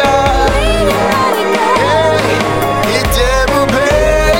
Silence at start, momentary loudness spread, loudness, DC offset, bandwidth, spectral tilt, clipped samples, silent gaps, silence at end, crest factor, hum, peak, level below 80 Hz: 0 s; 2 LU; -11 LUFS; under 0.1%; 17 kHz; -4.5 dB/octave; under 0.1%; none; 0 s; 10 dB; none; 0 dBFS; -20 dBFS